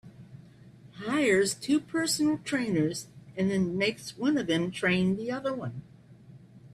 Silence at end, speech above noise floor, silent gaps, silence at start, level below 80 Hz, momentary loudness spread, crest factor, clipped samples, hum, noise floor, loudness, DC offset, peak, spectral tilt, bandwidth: 0.05 s; 25 dB; none; 0.05 s; -64 dBFS; 11 LU; 16 dB; under 0.1%; none; -52 dBFS; -28 LUFS; under 0.1%; -14 dBFS; -4.5 dB/octave; 13.5 kHz